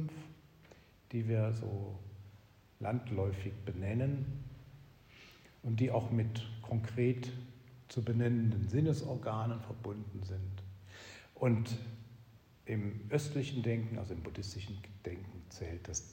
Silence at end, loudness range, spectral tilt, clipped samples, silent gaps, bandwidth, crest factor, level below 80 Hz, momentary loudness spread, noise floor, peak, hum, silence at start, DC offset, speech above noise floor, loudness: 0 s; 5 LU; -7 dB/octave; under 0.1%; none; 16 kHz; 18 dB; -64 dBFS; 19 LU; -61 dBFS; -20 dBFS; none; 0 s; under 0.1%; 25 dB; -38 LUFS